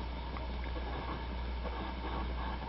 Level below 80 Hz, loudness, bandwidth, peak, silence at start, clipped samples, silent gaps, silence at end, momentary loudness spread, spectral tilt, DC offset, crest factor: -40 dBFS; -40 LUFS; 5.6 kHz; -26 dBFS; 0 s; under 0.1%; none; 0 s; 2 LU; -4.5 dB/octave; under 0.1%; 12 dB